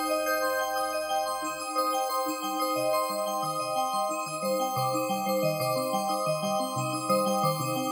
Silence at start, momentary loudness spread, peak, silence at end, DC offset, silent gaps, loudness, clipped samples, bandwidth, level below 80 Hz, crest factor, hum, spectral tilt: 0 s; 3 LU; -14 dBFS; 0 s; under 0.1%; none; -28 LUFS; under 0.1%; over 20 kHz; -70 dBFS; 14 dB; none; -4 dB/octave